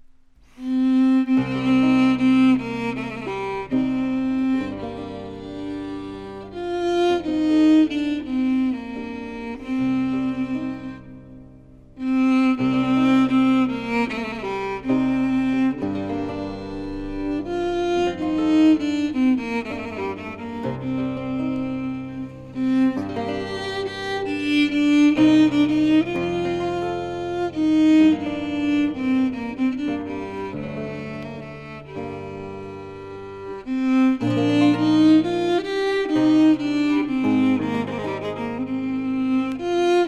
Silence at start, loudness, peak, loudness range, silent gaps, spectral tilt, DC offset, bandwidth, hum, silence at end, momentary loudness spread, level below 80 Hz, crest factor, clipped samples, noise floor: 0.05 s; -21 LUFS; -6 dBFS; 7 LU; none; -6.5 dB/octave; under 0.1%; 9 kHz; none; 0 s; 15 LU; -50 dBFS; 14 dB; under 0.1%; -51 dBFS